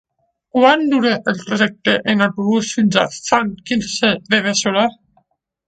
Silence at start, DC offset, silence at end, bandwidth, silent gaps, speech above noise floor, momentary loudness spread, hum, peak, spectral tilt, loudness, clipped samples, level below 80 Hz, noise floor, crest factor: 0.55 s; under 0.1%; 0.75 s; 9.2 kHz; none; 45 dB; 7 LU; none; 0 dBFS; -4 dB/octave; -16 LUFS; under 0.1%; -56 dBFS; -61 dBFS; 16 dB